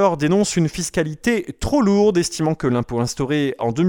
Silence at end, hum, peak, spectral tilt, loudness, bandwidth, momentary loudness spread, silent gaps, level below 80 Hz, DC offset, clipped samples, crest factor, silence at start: 0 s; none; -4 dBFS; -5.5 dB/octave; -19 LUFS; 18 kHz; 6 LU; none; -42 dBFS; under 0.1%; under 0.1%; 14 dB; 0 s